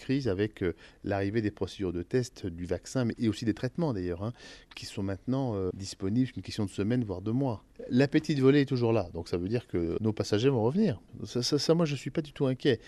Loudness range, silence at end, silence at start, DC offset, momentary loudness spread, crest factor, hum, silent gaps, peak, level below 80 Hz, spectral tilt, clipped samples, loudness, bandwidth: 5 LU; 0 s; 0 s; under 0.1%; 10 LU; 18 dB; none; none; -10 dBFS; -58 dBFS; -6.5 dB/octave; under 0.1%; -30 LUFS; 12.5 kHz